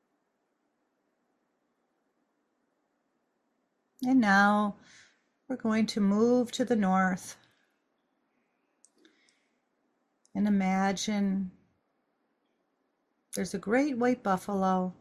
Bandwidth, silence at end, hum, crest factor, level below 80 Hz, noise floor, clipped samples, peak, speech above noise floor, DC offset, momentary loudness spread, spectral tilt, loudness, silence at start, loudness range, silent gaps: 13.5 kHz; 0.1 s; none; 18 dB; -70 dBFS; -78 dBFS; under 0.1%; -12 dBFS; 51 dB; under 0.1%; 13 LU; -5.5 dB/octave; -28 LUFS; 4 s; 7 LU; none